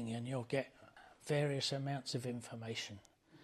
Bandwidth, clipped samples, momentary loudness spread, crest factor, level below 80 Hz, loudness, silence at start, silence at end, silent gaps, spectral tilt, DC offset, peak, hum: 13.5 kHz; under 0.1%; 18 LU; 18 dB; -78 dBFS; -40 LUFS; 0 s; 0 s; none; -5 dB/octave; under 0.1%; -22 dBFS; none